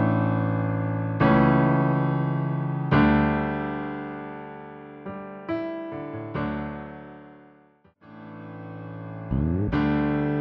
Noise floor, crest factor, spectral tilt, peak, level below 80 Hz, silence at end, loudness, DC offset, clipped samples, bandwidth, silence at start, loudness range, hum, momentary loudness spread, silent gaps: -58 dBFS; 18 dB; -10.5 dB/octave; -8 dBFS; -42 dBFS; 0 s; -25 LUFS; under 0.1%; under 0.1%; 5.4 kHz; 0 s; 13 LU; none; 20 LU; none